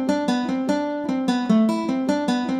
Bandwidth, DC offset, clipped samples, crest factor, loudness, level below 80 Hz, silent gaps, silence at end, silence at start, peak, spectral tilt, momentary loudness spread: 13 kHz; under 0.1%; under 0.1%; 14 dB; -22 LUFS; -64 dBFS; none; 0 s; 0 s; -8 dBFS; -6 dB/octave; 5 LU